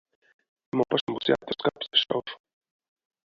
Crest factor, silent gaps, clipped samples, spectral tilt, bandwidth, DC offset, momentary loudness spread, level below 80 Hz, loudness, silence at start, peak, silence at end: 22 dB; 1.01-1.07 s; under 0.1%; -6 dB/octave; 7.4 kHz; under 0.1%; 9 LU; -68 dBFS; -27 LUFS; 0.75 s; -8 dBFS; 0.9 s